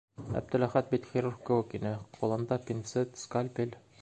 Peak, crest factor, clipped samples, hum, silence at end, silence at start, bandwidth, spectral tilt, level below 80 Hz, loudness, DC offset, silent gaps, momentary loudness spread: -12 dBFS; 22 dB; under 0.1%; none; 0.25 s; 0.2 s; 9 kHz; -7 dB/octave; -62 dBFS; -33 LUFS; under 0.1%; none; 8 LU